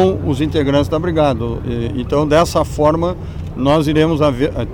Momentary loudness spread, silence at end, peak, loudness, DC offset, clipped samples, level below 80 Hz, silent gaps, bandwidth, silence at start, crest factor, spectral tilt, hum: 8 LU; 0 s; -4 dBFS; -16 LUFS; under 0.1%; under 0.1%; -30 dBFS; none; 17.5 kHz; 0 s; 12 dB; -7 dB/octave; none